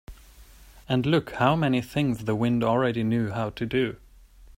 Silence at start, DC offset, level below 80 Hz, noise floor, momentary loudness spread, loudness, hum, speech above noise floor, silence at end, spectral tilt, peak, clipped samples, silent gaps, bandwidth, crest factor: 0.1 s; under 0.1%; -50 dBFS; -51 dBFS; 6 LU; -25 LUFS; none; 26 dB; 0.15 s; -7.5 dB/octave; -8 dBFS; under 0.1%; none; 16 kHz; 18 dB